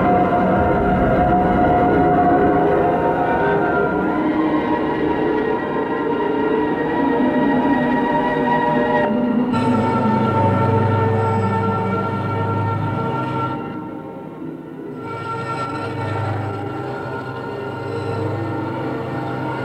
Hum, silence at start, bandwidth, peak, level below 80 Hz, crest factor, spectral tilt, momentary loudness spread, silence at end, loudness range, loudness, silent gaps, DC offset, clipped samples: none; 0 s; 9.6 kHz; -4 dBFS; -40 dBFS; 14 dB; -8.5 dB/octave; 11 LU; 0 s; 9 LU; -19 LUFS; none; under 0.1%; under 0.1%